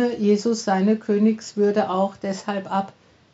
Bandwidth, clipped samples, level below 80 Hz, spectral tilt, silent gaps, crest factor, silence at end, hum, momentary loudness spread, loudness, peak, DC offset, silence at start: 8 kHz; under 0.1%; -70 dBFS; -6 dB/octave; none; 14 dB; 0.45 s; none; 7 LU; -22 LUFS; -8 dBFS; under 0.1%; 0 s